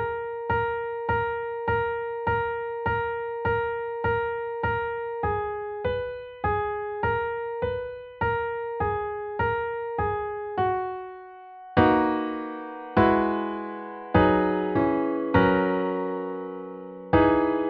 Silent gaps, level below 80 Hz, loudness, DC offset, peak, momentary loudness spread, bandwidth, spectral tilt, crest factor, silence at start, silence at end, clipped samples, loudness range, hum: none; -46 dBFS; -26 LUFS; under 0.1%; -6 dBFS; 13 LU; 5.2 kHz; -5.5 dB/octave; 20 dB; 0 s; 0 s; under 0.1%; 5 LU; none